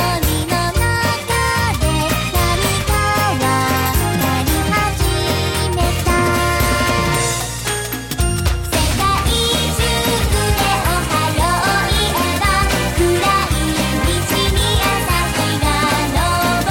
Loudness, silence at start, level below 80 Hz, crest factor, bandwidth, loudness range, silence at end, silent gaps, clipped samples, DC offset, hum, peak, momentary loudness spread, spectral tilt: -16 LUFS; 0 s; -24 dBFS; 12 dB; 17 kHz; 1 LU; 0 s; none; under 0.1%; 0.2%; none; -4 dBFS; 3 LU; -4 dB/octave